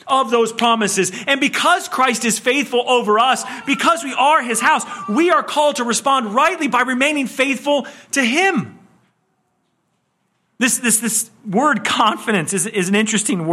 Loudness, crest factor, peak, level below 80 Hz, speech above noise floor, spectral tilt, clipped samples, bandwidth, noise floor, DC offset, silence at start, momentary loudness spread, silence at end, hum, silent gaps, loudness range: -16 LUFS; 16 dB; 0 dBFS; -66 dBFS; 50 dB; -2.5 dB/octave; under 0.1%; 15.5 kHz; -67 dBFS; under 0.1%; 0.05 s; 5 LU; 0 s; none; none; 4 LU